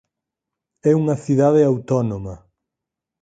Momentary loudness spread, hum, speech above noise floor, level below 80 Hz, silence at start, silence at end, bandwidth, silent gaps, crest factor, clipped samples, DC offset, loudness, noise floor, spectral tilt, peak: 12 LU; none; 67 dB; -52 dBFS; 0.85 s; 0.85 s; 9 kHz; none; 16 dB; under 0.1%; under 0.1%; -18 LUFS; -84 dBFS; -9 dB/octave; -4 dBFS